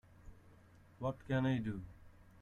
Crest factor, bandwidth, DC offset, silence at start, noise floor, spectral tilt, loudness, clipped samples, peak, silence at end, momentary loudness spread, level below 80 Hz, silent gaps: 18 dB; 7 kHz; under 0.1%; 0.25 s; -63 dBFS; -8.5 dB/octave; -39 LUFS; under 0.1%; -24 dBFS; 0.1 s; 13 LU; -62 dBFS; none